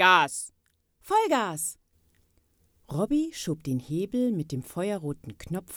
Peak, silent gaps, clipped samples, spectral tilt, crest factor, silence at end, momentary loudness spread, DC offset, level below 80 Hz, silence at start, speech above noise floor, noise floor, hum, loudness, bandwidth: -6 dBFS; none; under 0.1%; -4 dB/octave; 22 dB; 0 s; 13 LU; under 0.1%; -58 dBFS; 0 s; 43 dB; -70 dBFS; none; -28 LUFS; over 20 kHz